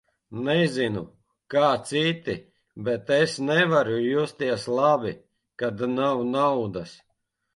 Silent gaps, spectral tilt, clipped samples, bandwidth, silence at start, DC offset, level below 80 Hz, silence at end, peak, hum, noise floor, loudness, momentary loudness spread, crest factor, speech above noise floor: none; -5.5 dB/octave; under 0.1%; 11.5 kHz; 0.3 s; under 0.1%; -62 dBFS; 0.6 s; -6 dBFS; none; -75 dBFS; -24 LUFS; 13 LU; 18 dB; 52 dB